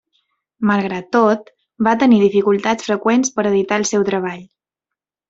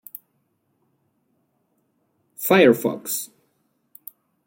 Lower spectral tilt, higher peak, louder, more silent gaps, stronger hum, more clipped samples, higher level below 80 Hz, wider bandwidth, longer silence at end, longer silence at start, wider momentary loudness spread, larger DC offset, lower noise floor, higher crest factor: about the same, -5 dB/octave vs -4.5 dB/octave; about the same, -2 dBFS vs -4 dBFS; first, -16 LUFS vs -19 LUFS; neither; neither; neither; first, -60 dBFS vs -70 dBFS; second, 8 kHz vs 17 kHz; second, 0.85 s vs 1.2 s; second, 0.6 s vs 2.4 s; second, 9 LU vs 27 LU; neither; first, -84 dBFS vs -70 dBFS; second, 16 dB vs 22 dB